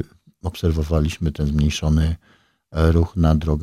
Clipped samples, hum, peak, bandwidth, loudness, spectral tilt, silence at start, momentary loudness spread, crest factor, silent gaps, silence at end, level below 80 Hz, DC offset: under 0.1%; none; -2 dBFS; 13 kHz; -20 LUFS; -7 dB/octave; 0 s; 13 LU; 18 dB; none; 0 s; -26 dBFS; under 0.1%